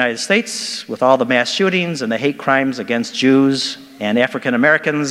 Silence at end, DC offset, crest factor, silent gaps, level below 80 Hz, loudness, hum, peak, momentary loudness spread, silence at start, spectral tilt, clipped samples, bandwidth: 0 s; under 0.1%; 16 dB; none; -66 dBFS; -16 LUFS; none; 0 dBFS; 8 LU; 0 s; -4 dB/octave; under 0.1%; 13.5 kHz